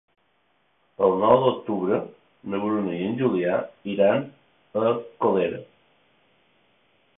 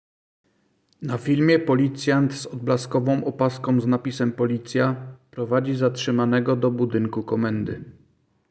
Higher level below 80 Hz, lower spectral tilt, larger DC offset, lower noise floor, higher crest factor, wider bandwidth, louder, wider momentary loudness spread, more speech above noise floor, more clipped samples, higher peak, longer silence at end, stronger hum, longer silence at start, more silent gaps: second, -64 dBFS vs -58 dBFS; first, -11 dB/octave vs -7 dB/octave; neither; about the same, -68 dBFS vs -66 dBFS; first, 22 dB vs 16 dB; second, 3.9 kHz vs 8 kHz; about the same, -24 LUFS vs -23 LUFS; first, 13 LU vs 10 LU; about the same, 45 dB vs 44 dB; neither; about the same, -4 dBFS vs -6 dBFS; first, 1.55 s vs 0.6 s; neither; about the same, 1 s vs 1 s; neither